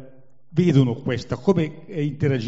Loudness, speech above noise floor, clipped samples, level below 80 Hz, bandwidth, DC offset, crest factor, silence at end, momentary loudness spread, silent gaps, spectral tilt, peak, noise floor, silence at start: -22 LUFS; 30 dB; under 0.1%; -54 dBFS; 8 kHz; 0.7%; 18 dB; 0 s; 9 LU; none; -7.5 dB/octave; -4 dBFS; -51 dBFS; 0 s